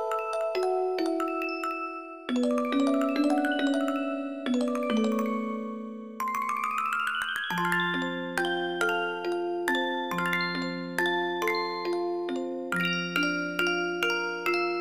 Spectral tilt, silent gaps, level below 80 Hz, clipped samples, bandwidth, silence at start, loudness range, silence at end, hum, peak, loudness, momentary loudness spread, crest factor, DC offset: -4.5 dB/octave; none; -74 dBFS; under 0.1%; 15.5 kHz; 0 s; 2 LU; 0 s; none; -10 dBFS; -28 LUFS; 6 LU; 18 dB; 0.1%